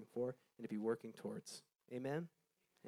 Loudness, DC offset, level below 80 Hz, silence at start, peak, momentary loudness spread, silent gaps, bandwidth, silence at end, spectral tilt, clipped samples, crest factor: -47 LUFS; under 0.1%; under -90 dBFS; 0 s; -28 dBFS; 12 LU; none; 15.5 kHz; 0 s; -6 dB/octave; under 0.1%; 18 dB